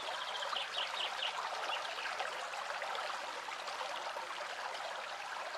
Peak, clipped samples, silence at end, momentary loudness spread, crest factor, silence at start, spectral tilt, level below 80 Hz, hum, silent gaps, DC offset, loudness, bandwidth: -22 dBFS; under 0.1%; 0 s; 5 LU; 18 dB; 0 s; 1 dB/octave; -84 dBFS; none; none; under 0.1%; -39 LUFS; over 20 kHz